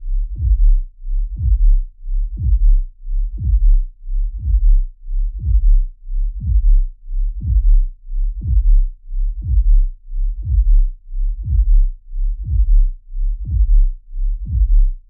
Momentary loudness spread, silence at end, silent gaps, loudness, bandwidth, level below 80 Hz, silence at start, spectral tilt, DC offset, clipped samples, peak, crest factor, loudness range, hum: 10 LU; 0.1 s; none; -21 LUFS; 0.4 kHz; -14 dBFS; 0 s; -15.5 dB/octave; under 0.1%; under 0.1%; -4 dBFS; 10 dB; 0 LU; none